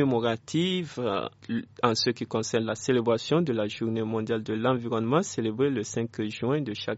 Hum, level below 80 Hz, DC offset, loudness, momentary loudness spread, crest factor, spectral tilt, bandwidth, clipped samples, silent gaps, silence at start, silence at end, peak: none; -68 dBFS; under 0.1%; -28 LUFS; 6 LU; 22 dB; -5 dB/octave; 8 kHz; under 0.1%; none; 0 s; 0 s; -6 dBFS